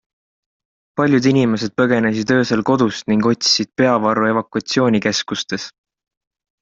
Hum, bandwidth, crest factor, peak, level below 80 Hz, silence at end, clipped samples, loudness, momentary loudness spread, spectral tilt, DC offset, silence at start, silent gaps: none; 7.8 kHz; 16 dB; -2 dBFS; -56 dBFS; 0.95 s; under 0.1%; -17 LUFS; 8 LU; -4.5 dB/octave; under 0.1%; 0.95 s; none